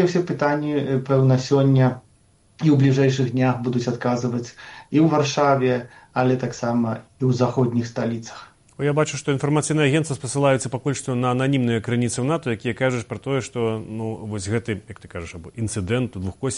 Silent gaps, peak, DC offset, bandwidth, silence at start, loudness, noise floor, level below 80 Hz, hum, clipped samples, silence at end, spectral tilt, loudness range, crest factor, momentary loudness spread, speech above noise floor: none; -6 dBFS; under 0.1%; 11 kHz; 0 s; -22 LUFS; -57 dBFS; -54 dBFS; none; under 0.1%; 0 s; -6.5 dB/octave; 6 LU; 16 dB; 11 LU; 36 dB